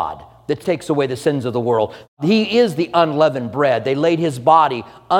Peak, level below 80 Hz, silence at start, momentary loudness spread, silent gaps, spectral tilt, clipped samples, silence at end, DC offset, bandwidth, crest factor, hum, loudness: 0 dBFS; -56 dBFS; 0 s; 10 LU; 2.08-2.17 s; -6.5 dB/octave; under 0.1%; 0 s; under 0.1%; 16.5 kHz; 16 dB; none; -17 LUFS